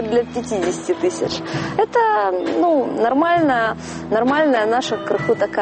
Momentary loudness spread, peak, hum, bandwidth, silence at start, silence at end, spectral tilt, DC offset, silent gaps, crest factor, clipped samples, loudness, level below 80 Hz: 7 LU; -4 dBFS; none; 8.8 kHz; 0 s; 0 s; -5 dB/octave; under 0.1%; none; 14 dB; under 0.1%; -18 LUFS; -52 dBFS